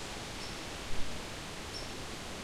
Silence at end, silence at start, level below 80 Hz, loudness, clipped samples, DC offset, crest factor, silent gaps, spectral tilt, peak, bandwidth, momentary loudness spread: 0 s; 0 s; -48 dBFS; -41 LUFS; under 0.1%; under 0.1%; 18 dB; none; -3 dB/octave; -20 dBFS; 15.5 kHz; 1 LU